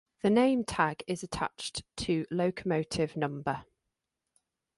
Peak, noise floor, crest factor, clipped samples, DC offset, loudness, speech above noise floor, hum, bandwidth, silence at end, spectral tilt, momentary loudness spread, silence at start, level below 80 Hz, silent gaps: -12 dBFS; -86 dBFS; 20 dB; under 0.1%; under 0.1%; -31 LUFS; 55 dB; none; 11.5 kHz; 1.15 s; -5.5 dB/octave; 11 LU; 0.25 s; -58 dBFS; none